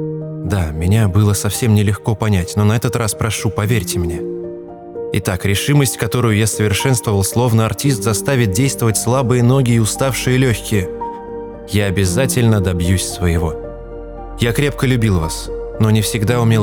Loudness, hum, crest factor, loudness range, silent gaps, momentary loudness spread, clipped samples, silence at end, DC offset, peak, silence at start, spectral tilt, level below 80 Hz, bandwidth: -16 LUFS; none; 14 dB; 3 LU; none; 12 LU; under 0.1%; 0 s; under 0.1%; -2 dBFS; 0 s; -5.5 dB/octave; -36 dBFS; 19.5 kHz